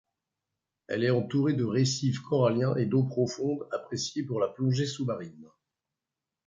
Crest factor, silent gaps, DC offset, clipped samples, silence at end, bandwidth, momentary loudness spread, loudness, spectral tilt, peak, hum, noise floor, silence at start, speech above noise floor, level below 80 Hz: 16 dB; none; under 0.1%; under 0.1%; 1 s; 7.6 kHz; 8 LU; -29 LUFS; -6 dB/octave; -12 dBFS; none; -89 dBFS; 0.9 s; 61 dB; -68 dBFS